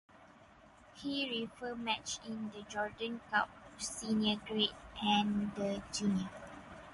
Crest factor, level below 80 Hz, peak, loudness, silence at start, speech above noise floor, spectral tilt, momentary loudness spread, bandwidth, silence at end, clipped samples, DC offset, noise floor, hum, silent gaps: 18 dB; -64 dBFS; -20 dBFS; -37 LUFS; 0.15 s; 24 dB; -3.5 dB/octave; 11 LU; 11.5 kHz; 0 s; under 0.1%; under 0.1%; -60 dBFS; none; none